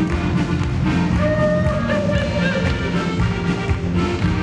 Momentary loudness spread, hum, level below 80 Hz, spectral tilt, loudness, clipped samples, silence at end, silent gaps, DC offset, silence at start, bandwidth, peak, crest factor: 3 LU; none; -28 dBFS; -7 dB/octave; -19 LUFS; under 0.1%; 0 s; none; under 0.1%; 0 s; 10 kHz; -6 dBFS; 12 dB